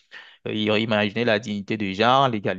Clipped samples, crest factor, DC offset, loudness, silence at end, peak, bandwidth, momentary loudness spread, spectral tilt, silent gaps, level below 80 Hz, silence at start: under 0.1%; 20 dB; under 0.1%; -22 LUFS; 0 s; -4 dBFS; 7.6 kHz; 10 LU; -6 dB/octave; none; -58 dBFS; 0.15 s